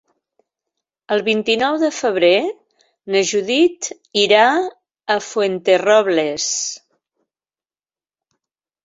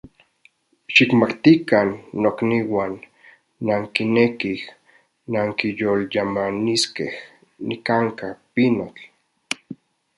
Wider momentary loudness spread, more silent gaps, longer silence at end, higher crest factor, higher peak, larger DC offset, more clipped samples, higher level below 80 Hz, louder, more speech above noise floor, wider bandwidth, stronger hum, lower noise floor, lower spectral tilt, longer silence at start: second, 10 LU vs 15 LU; neither; first, 2.05 s vs 0.45 s; about the same, 18 dB vs 22 dB; about the same, -2 dBFS vs 0 dBFS; neither; neither; second, -66 dBFS vs -60 dBFS; first, -17 LUFS vs -20 LUFS; first, over 74 dB vs 39 dB; second, 8 kHz vs 11.5 kHz; neither; first, under -90 dBFS vs -59 dBFS; second, -2.5 dB/octave vs -5 dB/octave; first, 1.1 s vs 0.9 s